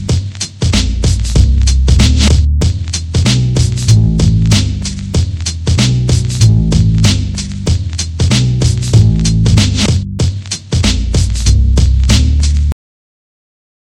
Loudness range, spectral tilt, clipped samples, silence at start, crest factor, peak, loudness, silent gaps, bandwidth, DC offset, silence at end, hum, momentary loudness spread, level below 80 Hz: 2 LU; -5 dB/octave; 0.2%; 0 s; 10 dB; 0 dBFS; -12 LUFS; none; 12 kHz; under 0.1%; 1.1 s; none; 7 LU; -14 dBFS